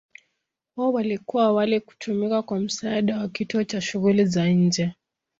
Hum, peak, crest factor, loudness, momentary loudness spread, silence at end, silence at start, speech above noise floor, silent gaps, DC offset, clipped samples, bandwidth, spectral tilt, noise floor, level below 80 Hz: none; -8 dBFS; 16 dB; -23 LUFS; 7 LU; 0.45 s; 0.75 s; 56 dB; none; under 0.1%; under 0.1%; 7.8 kHz; -6 dB/octave; -78 dBFS; -64 dBFS